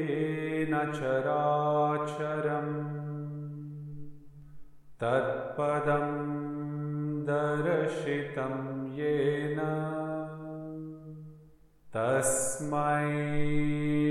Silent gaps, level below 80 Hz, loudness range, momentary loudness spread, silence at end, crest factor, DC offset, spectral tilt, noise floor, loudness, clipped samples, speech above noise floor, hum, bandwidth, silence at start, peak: none; -54 dBFS; 4 LU; 13 LU; 0 s; 16 dB; under 0.1%; -6 dB/octave; -57 dBFS; -31 LUFS; under 0.1%; 28 dB; 50 Hz at -65 dBFS; 13.5 kHz; 0 s; -14 dBFS